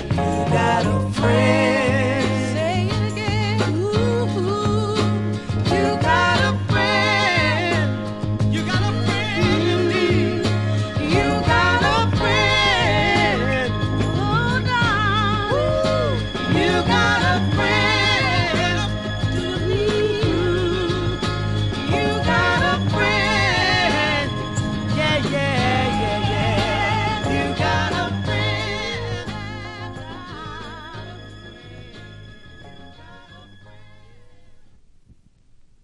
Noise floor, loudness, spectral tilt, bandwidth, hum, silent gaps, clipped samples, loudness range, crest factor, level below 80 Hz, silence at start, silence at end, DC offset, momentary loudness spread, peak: -52 dBFS; -19 LUFS; -5.5 dB/octave; 11.5 kHz; none; none; under 0.1%; 8 LU; 16 dB; -38 dBFS; 0 s; 1.2 s; under 0.1%; 9 LU; -4 dBFS